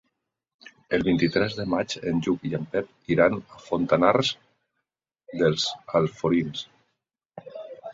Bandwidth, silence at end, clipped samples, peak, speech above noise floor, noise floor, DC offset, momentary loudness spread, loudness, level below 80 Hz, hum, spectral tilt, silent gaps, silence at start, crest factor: 7.8 kHz; 0 s; under 0.1%; -4 dBFS; 59 dB; -83 dBFS; under 0.1%; 18 LU; -25 LUFS; -56 dBFS; none; -5.5 dB/octave; 7.25-7.29 s; 0.9 s; 22 dB